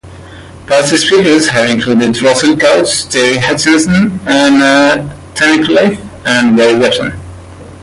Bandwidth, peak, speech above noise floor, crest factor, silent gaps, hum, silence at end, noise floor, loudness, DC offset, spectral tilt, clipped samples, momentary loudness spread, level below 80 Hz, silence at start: 11.5 kHz; 0 dBFS; 22 dB; 10 dB; none; none; 0 s; -31 dBFS; -9 LUFS; under 0.1%; -4 dB/octave; under 0.1%; 6 LU; -40 dBFS; 0.05 s